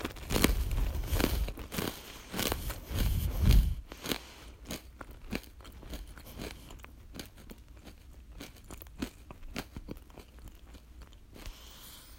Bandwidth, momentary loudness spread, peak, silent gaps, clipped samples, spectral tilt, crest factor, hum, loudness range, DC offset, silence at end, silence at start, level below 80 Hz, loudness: 17 kHz; 23 LU; -8 dBFS; none; under 0.1%; -4.5 dB/octave; 28 dB; none; 14 LU; under 0.1%; 0 s; 0 s; -38 dBFS; -35 LUFS